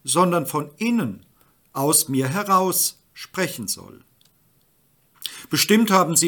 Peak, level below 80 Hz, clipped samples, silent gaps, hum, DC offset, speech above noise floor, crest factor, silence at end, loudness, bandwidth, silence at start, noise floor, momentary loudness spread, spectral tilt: -2 dBFS; -70 dBFS; under 0.1%; none; none; under 0.1%; 42 dB; 22 dB; 0 s; -20 LUFS; 19 kHz; 0.05 s; -62 dBFS; 17 LU; -3.5 dB/octave